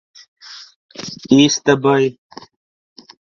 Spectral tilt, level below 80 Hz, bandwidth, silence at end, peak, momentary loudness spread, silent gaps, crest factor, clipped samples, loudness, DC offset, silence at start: -4.5 dB/octave; -58 dBFS; 7.2 kHz; 1.2 s; 0 dBFS; 24 LU; 0.76-0.89 s; 18 dB; under 0.1%; -14 LUFS; under 0.1%; 0.5 s